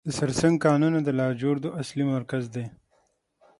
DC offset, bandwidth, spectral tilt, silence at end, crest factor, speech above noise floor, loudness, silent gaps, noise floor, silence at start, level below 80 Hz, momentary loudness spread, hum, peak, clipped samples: under 0.1%; 11.5 kHz; -6.5 dB/octave; 0.9 s; 18 dB; 44 dB; -25 LUFS; none; -69 dBFS; 0.05 s; -58 dBFS; 11 LU; none; -6 dBFS; under 0.1%